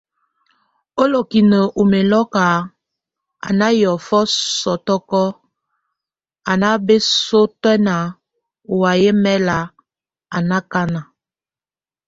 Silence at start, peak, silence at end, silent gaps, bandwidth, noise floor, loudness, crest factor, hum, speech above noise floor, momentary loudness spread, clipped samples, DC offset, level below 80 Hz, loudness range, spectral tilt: 0.95 s; 0 dBFS; 1.05 s; none; 8 kHz; under -90 dBFS; -16 LUFS; 18 dB; none; over 75 dB; 10 LU; under 0.1%; under 0.1%; -54 dBFS; 3 LU; -5 dB/octave